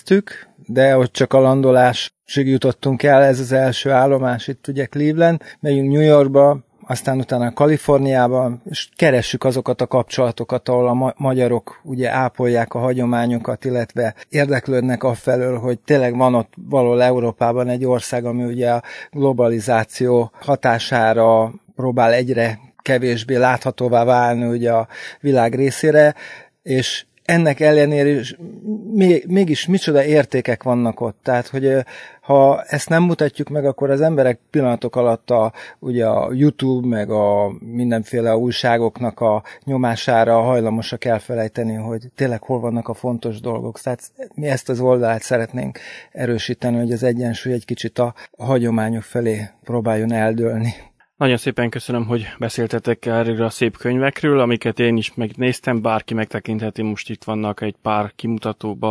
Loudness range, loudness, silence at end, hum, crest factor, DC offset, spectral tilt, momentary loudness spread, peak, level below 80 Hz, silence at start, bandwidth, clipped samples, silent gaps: 5 LU; -18 LUFS; 0 s; none; 16 dB; under 0.1%; -6.5 dB/octave; 10 LU; 0 dBFS; -58 dBFS; 0.05 s; 11 kHz; under 0.1%; none